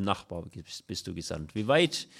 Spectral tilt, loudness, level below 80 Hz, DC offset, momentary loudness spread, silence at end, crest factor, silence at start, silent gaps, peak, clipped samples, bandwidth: -4.5 dB/octave; -30 LUFS; -60 dBFS; under 0.1%; 16 LU; 0 s; 20 dB; 0 s; none; -12 dBFS; under 0.1%; 15 kHz